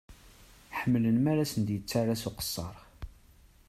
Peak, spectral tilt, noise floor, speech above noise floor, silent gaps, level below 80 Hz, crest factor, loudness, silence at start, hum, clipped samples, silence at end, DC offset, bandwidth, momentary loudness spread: -14 dBFS; -6 dB/octave; -59 dBFS; 30 dB; none; -54 dBFS; 18 dB; -30 LUFS; 0.1 s; none; under 0.1%; 0.6 s; under 0.1%; 14.5 kHz; 22 LU